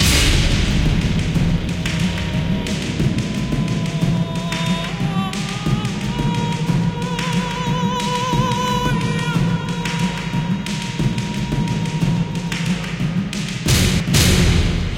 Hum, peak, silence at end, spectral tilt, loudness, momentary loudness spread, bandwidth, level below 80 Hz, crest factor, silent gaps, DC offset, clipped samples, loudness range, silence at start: none; -2 dBFS; 0 s; -5 dB/octave; -19 LUFS; 6 LU; 17 kHz; -28 dBFS; 16 dB; none; under 0.1%; under 0.1%; 3 LU; 0 s